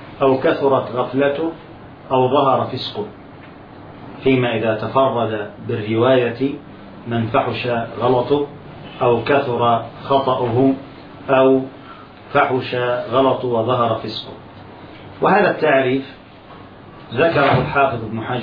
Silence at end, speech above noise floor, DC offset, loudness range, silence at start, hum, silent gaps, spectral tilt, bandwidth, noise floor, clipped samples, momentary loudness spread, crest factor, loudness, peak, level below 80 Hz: 0 s; 23 dB; under 0.1%; 3 LU; 0 s; none; none; -9 dB/octave; 5.2 kHz; -40 dBFS; under 0.1%; 22 LU; 16 dB; -18 LUFS; -2 dBFS; -50 dBFS